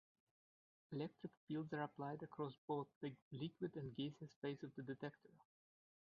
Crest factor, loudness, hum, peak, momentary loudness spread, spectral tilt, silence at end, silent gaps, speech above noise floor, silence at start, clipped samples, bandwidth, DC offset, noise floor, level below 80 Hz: 18 dB; -50 LUFS; none; -32 dBFS; 5 LU; -6 dB/octave; 0.7 s; 1.37-1.47 s, 2.58-2.68 s, 2.96-3.01 s, 3.22-3.31 s, 4.36-4.42 s; over 41 dB; 0.9 s; under 0.1%; 6.8 kHz; under 0.1%; under -90 dBFS; -86 dBFS